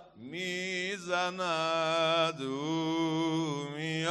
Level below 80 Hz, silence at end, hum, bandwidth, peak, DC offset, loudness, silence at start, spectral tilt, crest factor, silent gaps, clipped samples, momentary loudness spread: -76 dBFS; 0 s; none; 12 kHz; -18 dBFS; under 0.1%; -31 LUFS; 0 s; -4.5 dB/octave; 14 dB; none; under 0.1%; 8 LU